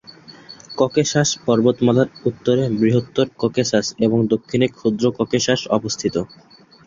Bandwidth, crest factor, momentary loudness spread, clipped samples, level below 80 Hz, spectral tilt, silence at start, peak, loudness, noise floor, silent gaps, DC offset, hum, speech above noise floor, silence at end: 7.6 kHz; 16 dB; 5 LU; under 0.1%; -54 dBFS; -5 dB/octave; 0.3 s; -2 dBFS; -19 LUFS; -43 dBFS; none; under 0.1%; none; 25 dB; 0.6 s